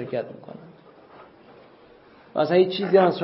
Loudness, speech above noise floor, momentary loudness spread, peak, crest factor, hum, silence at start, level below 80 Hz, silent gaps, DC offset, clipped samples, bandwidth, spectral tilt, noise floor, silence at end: -22 LUFS; 30 dB; 24 LU; -4 dBFS; 20 dB; none; 0 s; -72 dBFS; none; under 0.1%; under 0.1%; 5.8 kHz; -10.5 dB/octave; -51 dBFS; 0 s